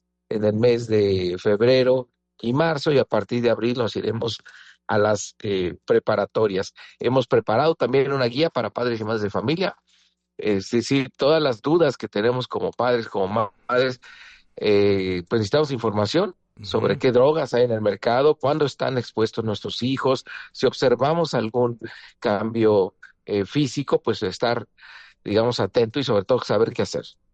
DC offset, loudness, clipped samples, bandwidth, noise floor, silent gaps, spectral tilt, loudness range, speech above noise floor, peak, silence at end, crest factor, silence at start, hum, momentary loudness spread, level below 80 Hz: under 0.1%; -22 LUFS; under 0.1%; 8.6 kHz; -63 dBFS; none; -6 dB/octave; 3 LU; 42 dB; -8 dBFS; 0.25 s; 14 dB; 0.3 s; none; 8 LU; -60 dBFS